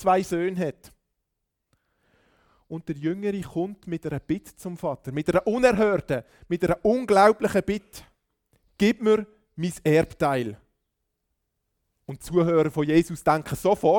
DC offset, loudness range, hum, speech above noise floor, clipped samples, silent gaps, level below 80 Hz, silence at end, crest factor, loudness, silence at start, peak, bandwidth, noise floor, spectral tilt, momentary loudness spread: under 0.1%; 10 LU; none; 57 dB; under 0.1%; none; -52 dBFS; 0 s; 20 dB; -24 LUFS; 0 s; -4 dBFS; 19 kHz; -81 dBFS; -6.5 dB/octave; 12 LU